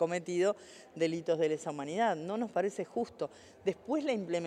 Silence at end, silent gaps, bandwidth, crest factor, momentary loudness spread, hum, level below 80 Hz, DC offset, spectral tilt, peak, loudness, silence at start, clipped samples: 0 s; none; 11 kHz; 16 dB; 7 LU; none; -80 dBFS; under 0.1%; -5.5 dB/octave; -18 dBFS; -34 LUFS; 0 s; under 0.1%